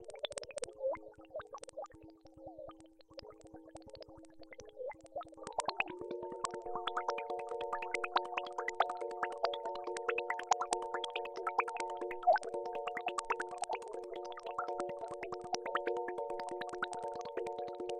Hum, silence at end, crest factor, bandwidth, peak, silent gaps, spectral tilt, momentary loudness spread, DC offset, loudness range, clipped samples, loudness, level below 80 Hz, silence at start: none; 0 s; 24 dB; 11 kHz; -16 dBFS; none; -2.5 dB/octave; 18 LU; under 0.1%; 14 LU; under 0.1%; -39 LUFS; -72 dBFS; 0 s